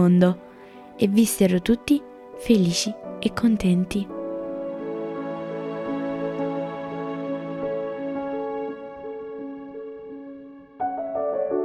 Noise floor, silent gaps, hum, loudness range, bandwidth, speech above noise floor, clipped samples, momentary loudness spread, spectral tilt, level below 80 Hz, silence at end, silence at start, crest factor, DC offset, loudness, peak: -44 dBFS; none; none; 10 LU; 14.5 kHz; 24 dB; under 0.1%; 18 LU; -6 dB/octave; -52 dBFS; 0 s; 0 s; 20 dB; under 0.1%; -25 LUFS; -4 dBFS